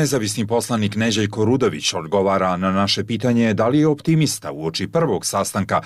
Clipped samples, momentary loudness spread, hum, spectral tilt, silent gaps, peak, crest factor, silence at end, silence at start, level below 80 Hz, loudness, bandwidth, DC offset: under 0.1%; 4 LU; none; -5 dB/octave; none; -8 dBFS; 12 dB; 0 s; 0 s; -54 dBFS; -19 LUFS; 15.5 kHz; under 0.1%